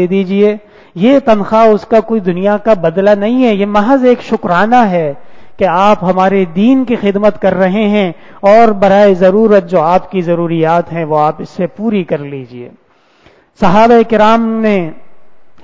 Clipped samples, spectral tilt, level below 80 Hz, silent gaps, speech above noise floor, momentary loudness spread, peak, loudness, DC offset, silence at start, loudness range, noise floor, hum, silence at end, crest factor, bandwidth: 0.6%; -7.5 dB/octave; -44 dBFS; none; 37 dB; 10 LU; 0 dBFS; -10 LUFS; under 0.1%; 0 s; 4 LU; -47 dBFS; none; 0 s; 10 dB; 7.6 kHz